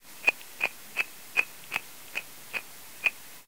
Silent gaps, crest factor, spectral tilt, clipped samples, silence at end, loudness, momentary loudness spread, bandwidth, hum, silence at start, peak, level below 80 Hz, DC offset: none; 28 dB; -0.5 dB/octave; under 0.1%; 0 s; -31 LUFS; 10 LU; 18 kHz; none; 0.05 s; -6 dBFS; -76 dBFS; 0.4%